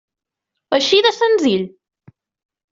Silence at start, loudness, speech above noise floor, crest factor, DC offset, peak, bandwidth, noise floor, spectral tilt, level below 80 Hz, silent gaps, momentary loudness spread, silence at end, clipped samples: 0.7 s; -15 LUFS; 65 dB; 16 dB; under 0.1%; -2 dBFS; 7.6 kHz; -80 dBFS; -3.5 dB/octave; -62 dBFS; none; 9 LU; 1.05 s; under 0.1%